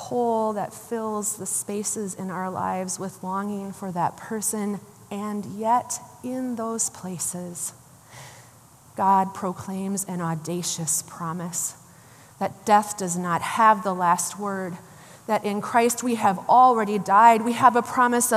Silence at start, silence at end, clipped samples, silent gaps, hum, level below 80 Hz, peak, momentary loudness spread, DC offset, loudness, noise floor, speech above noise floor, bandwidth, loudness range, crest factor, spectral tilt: 0 s; 0 s; under 0.1%; none; none; -70 dBFS; -4 dBFS; 13 LU; under 0.1%; -24 LUFS; -51 dBFS; 28 dB; 15 kHz; 8 LU; 20 dB; -4 dB/octave